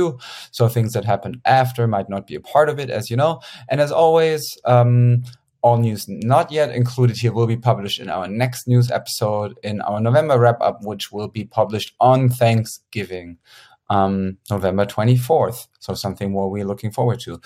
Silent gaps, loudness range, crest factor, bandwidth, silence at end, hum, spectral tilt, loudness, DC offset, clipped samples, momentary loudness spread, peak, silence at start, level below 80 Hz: none; 3 LU; 18 dB; 15.5 kHz; 0.1 s; none; -6.5 dB/octave; -19 LUFS; under 0.1%; under 0.1%; 12 LU; -2 dBFS; 0 s; -58 dBFS